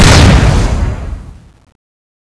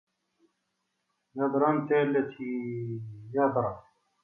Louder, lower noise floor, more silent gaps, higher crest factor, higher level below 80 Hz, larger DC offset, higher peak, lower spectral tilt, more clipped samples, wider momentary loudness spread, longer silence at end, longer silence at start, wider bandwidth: first, -9 LUFS vs -29 LUFS; second, -29 dBFS vs -80 dBFS; neither; second, 10 dB vs 18 dB; first, -14 dBFS vs -68 dBFS; neither; first, 0 dBFS vs -12 dBFS; second, -5 dB/octave vs -10 dB/octave; first, 2% vs under 0.1%; first, 21 LU vs 13 LU; first, 0.95 s vs 0.45 s; second, 0 s vs 1.35 s; first, 11 kHz vs 3.7 kHz